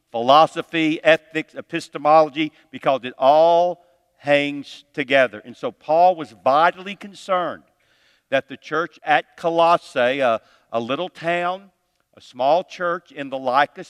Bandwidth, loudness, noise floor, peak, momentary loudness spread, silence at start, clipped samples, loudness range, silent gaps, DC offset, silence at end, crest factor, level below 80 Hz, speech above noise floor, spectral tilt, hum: 11.5 kHz; -20 LUFS; -61 dBFS; 0 dBFS; 15 LU; 0.15 s; under 0.1%; 4 LU; none; under 0.1%; 0.05 s; 20 dB; -74 dBFS; 41 dB; -5 dB/octave; none